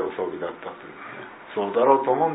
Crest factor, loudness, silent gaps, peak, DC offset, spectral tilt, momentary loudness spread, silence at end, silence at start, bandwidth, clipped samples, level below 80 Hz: 20 dB; -23 LUFS; none; -4 dBFS; under 0.1%; -10 dB/octave; 19 LU; 0 s; 0 s; 4 kHz; under 0.1%; -70 dBFS